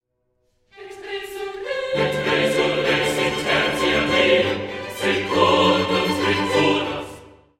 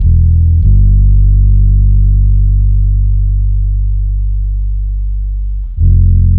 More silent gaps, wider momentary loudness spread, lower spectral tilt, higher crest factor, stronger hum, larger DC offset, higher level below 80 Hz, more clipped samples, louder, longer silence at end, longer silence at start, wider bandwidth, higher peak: neither; first, 14 LU vs 9 LU; second, -4 dB/octave vs -15.5 dB/octave; first, 20 dB vs 8 dB; second, none vs 50 Hz at -40 dBFS; second, under 0.1% vs 1%; second, -50 dBFS vs -10 dBFS; neither; second, -19 LUFS vs -12 LUFS; first, 0.3 s vs 0 s; first, 0.75 s vs 0 s; first, 16.5 kHz vs 0.5 kHz; about the same, -2 dBFS vs 0 dBFS